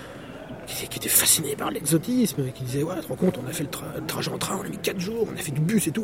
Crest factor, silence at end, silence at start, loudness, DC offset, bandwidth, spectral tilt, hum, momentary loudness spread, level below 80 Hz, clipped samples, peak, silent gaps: 24 dB; 0 s; 0 s; -25 LUFS; under 0.1%; 16.5 kHz; -4 dB/octave; none; 13 LU; -54 dBFS; under 0.1%; -2 dBFS; none